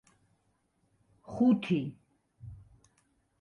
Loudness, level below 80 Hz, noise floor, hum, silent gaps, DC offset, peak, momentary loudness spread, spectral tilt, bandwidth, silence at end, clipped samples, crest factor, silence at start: -29 LUFS; -66 dBFS; -74 dBFS; none; none; under 0.1%; -16 dBFS; 24 LU; -8 dB/octave; 6.8 kHz; 0.85 s; under 0.1%; 18 dB; 1.3 s